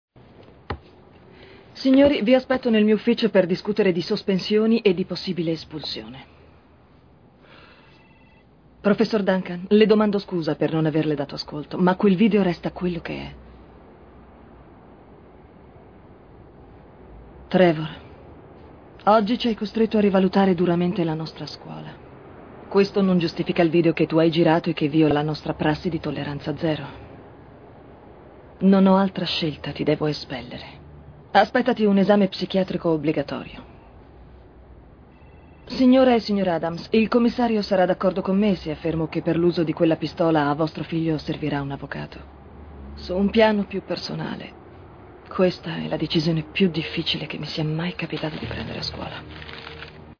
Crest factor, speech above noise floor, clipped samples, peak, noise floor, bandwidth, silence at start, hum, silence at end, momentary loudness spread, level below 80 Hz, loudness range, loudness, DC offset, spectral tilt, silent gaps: 22 dB; 32 dB; under 0.1%; 0 dBFS; -53 dBFS; 5.4 kHz; 0.7 s; none; 0.05 s; 18 LU; -50 dBFS; 7 LU; -22 LUFS; under 0.1%; -7.5 dB/octave; none